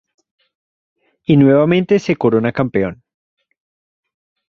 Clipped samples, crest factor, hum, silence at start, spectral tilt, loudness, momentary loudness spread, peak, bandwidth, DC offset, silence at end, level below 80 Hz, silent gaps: under 0.1%; 16 dB; none; 1.3 s; -8 dB/octave; -14 LUFS; 10 LU; -2 dBFS; 7.2 kHz; under 0.1%; 1.55 s; -52 dBFS; none